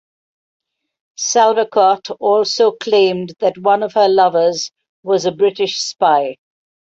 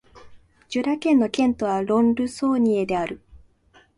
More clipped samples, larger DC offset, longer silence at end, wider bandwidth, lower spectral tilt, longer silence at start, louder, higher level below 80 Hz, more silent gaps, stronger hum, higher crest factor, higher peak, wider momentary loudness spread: neither; neither; about the same, 0.6 s vs 0.6 s; second, 8 kHz vs 11.5 kHz; second, -3 dB/octave vs -6 dB/octave; first, 1.2 s vs 0.15 s; first, -15 LUFS vs -22 LUFS; second, -66 dBFS vs -56 dBFS; first, 4.89-5.03 s vs none; neither; about the same, 14 dB vs 16 dB; first, -2 dBFS vs -8 dBFS; about the same, 7 LU vs 8 LU